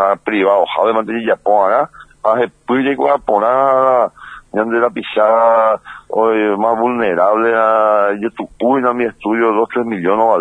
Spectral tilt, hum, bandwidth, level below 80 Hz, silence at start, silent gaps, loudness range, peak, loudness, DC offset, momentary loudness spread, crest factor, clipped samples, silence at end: -7 dB/octave; none; 9.6 kHz; -54 dBFS; 0 s; none; 1 LU; 0 dBFS; -14 LUFS; under 0.1%; 7 LU; 14 dB; under 0.1%; 0 s